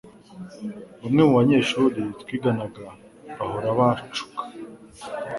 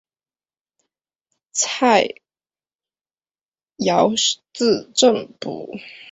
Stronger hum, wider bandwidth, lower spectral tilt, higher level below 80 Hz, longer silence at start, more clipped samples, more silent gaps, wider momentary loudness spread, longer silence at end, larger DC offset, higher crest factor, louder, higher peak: neither; first, 11.5 kHz vs 8.4 kHz; first, -6.5 dB/octave vs -2.5 dB/octave; first, -58 dBFS vs -66 dBFS; second, 0.05 s vs 1.55 s; neither; second, none vs 2.75-2.79 s; first, 24 LU vs 14 LU; about the same, 0 s vs 0 s; neither; about the same, 20 dB vs 20 dB; second, -22 LUFS vs -18 LUFS; about the same, -4 dBFS vs -2 dBFS